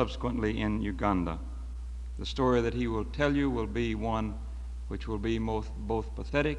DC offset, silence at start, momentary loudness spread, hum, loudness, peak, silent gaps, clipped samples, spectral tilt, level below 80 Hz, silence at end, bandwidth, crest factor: under 0.1%; 0 s; 14 LU; none; -32 LUFS; -12 dBFS; none; under 0.1%; -7 dB/octave; -38 dBFS; 0 s; 10 kHz; 20 dB